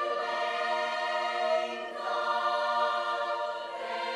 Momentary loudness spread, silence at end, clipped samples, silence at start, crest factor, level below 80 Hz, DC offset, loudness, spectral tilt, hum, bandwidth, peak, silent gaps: 7 LU; 0 s; under 0.1%; 0 s; 14 dB; -76 dBFS; under 0.1%; -30 LUFS; -1 dB/octave; none; 11.5 kHz; -16 dBFS; none